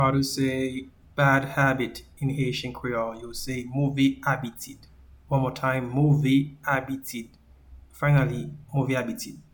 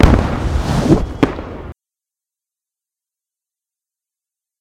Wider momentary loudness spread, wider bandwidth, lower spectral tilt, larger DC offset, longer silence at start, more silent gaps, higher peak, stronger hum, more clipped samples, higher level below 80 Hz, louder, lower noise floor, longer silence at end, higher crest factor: second, 13 LU vs 18 LU; first, 19 kHz vs 15.5 kHz; about the same, -6 dB/octave vs -7 dB/octave; neither; about the same, 0 s vs 0 s; neither; second, -8 dBFS vs 0 dBFS; neither; second, under 0.1% vs 0.1%; second, -50 dBFS vs -24 dBFS; second, -26 LUFS vs -16 LUFS; second, -50 dBFS vs -87 dBFS; second, 0.1 s vs 2.9 s; about the same, 18 dB vs 18 dB